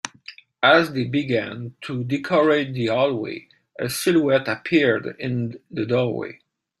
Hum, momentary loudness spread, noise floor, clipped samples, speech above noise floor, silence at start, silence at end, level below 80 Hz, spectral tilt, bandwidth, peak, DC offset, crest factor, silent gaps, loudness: none; 15 LU; -45 dBFS; under 0.1%; 24 dB; 0.05 s; 0.45 s; -62 dBFS; -5.5 dB/octave; 15.5 kHz; -2 dBFS; under 0.1%; 20 dB; none; -21 LUFS